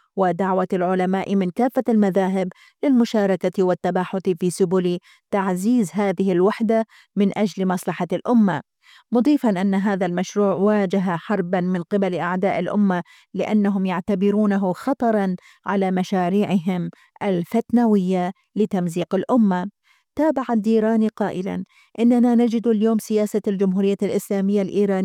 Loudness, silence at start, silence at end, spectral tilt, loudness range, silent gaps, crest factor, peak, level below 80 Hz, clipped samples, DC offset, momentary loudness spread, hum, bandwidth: -21 LUFS; 0.15 s; 0 s; -7.5 dB/octave; 2 LU; none; 12 dB; -8 dBFS; -66 dBFS; under 0.1%; under 0.1%; 7 LU; none; 14.5 kHz